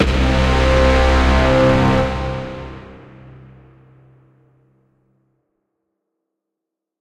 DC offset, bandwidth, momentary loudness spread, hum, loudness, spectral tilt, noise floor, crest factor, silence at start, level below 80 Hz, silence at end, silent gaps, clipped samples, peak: under 0.1%; 10 kHz; 17 LU; none; -15 LUFS; -6.5 dB/octave; -83 dBFS; 18 dB; 0 s; -22 dBFS; 4.05 s; none; under 0.1%; -2 dBFS